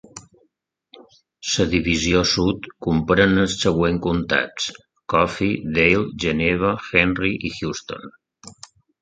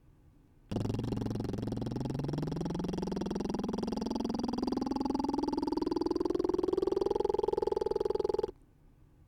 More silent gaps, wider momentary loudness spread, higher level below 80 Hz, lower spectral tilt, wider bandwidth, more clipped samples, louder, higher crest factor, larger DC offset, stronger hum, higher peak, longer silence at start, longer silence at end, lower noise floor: neither; first, 11 LU vs 5 LU; first, -40 dBFS vs -52 dBFS; second, -4.5 dB/octave vs -7.5 dB/octave; second, 9.4 kHz vs 14.5 kHz; neither; first, -20 LUFS vs -34 LUFS; about the same, 20 dB vs 16 dB; neither; neither; first, 0 dBFS vs -18 dBFS; second, 0.15 s vs 0.7 s; second, 0.5 s vs 0.75 s; first, -69 dBFS vs -61 dBFS